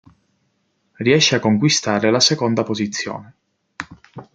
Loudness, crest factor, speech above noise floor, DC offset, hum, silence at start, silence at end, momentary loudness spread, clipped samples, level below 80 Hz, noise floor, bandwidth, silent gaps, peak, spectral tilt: -17 LUFS; 18 dB; 50 dB; under 0.1%; none; 1 s; 0.1 s; 20 LU; under 0.1%; -60 dBFS; -67 dBFS; 9.4 kHz; none; -2 dBFS; -4 dB/octave